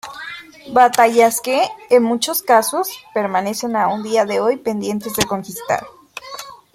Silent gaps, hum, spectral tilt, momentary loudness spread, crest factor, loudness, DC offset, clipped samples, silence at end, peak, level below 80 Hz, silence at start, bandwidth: none; none; -3.5 dB/octave; 19 LU; 16 dB; -17 LUFS; under 0.1%; under 0.1%; 0.2 s; 0 dBFS; -56 dBFS; 0.05 s; 16.5 kHz